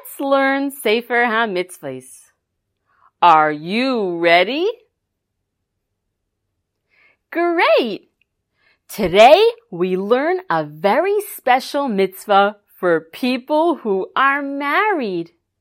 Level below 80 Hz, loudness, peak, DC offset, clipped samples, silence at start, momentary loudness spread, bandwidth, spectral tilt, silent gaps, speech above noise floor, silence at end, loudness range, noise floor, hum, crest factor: -56 dBFS; -17 LUFS; 0 dBFS; under 0.1%; under 0.1%; 0.05 s; 12 LU; 16.5 kHz; -4.5 dB/octave; none; 59 dB; 0.35 s; 7 LU; -76 dBFS; none; 18 dB